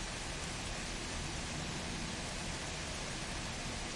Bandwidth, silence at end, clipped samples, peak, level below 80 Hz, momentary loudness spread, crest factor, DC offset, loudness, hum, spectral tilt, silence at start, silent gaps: 11.5 kHz; 0 s; under 0.1%; -28 dBFS; -48 dBFS; 1 LU; 12 dB; under 0.1%; -40 LUFS; none; -3 dB/octave; 0 s; none